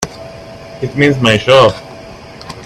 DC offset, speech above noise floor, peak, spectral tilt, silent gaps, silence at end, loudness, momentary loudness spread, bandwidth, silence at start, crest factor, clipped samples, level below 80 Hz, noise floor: under 0.1%; 22 dB; 0 dBFS; -5 dB/octave; none; 0 s; -10 LUFS; 24 LU; 13 kHz; 0 s; 14 dB; under 0.1%; -42 dBFS; -32 dBFS